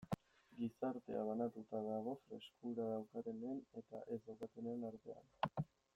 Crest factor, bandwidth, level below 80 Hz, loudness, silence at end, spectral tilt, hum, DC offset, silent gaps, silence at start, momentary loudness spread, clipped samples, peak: 22 dB; 16 kHz; -78 dBFS; -47 LUFS; 0.3 s; -8 dB/octave; none; under 0.1%; none; 0 s; 9 LU; under 0.1%; -24 dBFS